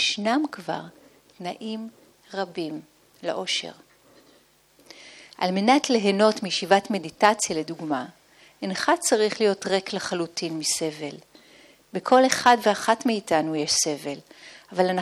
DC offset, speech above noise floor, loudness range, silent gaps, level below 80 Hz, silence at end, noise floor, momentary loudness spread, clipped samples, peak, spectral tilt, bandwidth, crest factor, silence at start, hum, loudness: under 0.1%; 35 dB; 10 LU; none; -70 dBFS; 0 s; -59 dBFS; 16 LU; under 0.1%; -2 dBFS; -3 dB/octave; 14.5 kHz; 22 dB; 0 s; none; -24 LUFS